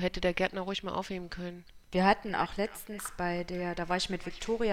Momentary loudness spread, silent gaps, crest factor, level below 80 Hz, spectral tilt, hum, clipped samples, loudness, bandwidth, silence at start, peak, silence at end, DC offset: 13 LU; none; 20 dB; -50 dBFS; -5 dB/octave; none; under 0.1%; -33 LUFS; 16.5 kHz; 0 s; -12 dBFS; 0 s; under 0.1%